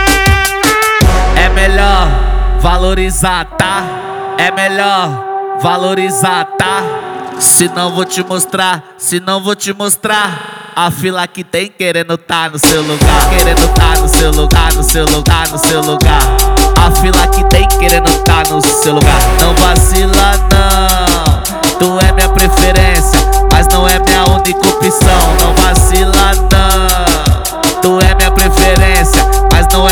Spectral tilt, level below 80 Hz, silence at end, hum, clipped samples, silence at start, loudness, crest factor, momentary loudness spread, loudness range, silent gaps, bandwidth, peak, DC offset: -3.5 dB/octave; -12 dBFS; 0 s; none; 0.9%; 0 s; -9 LUFS; 8 dB; 6 LU; 4 LU; none; over 20 kHz; 0 dBFS; under 0.1%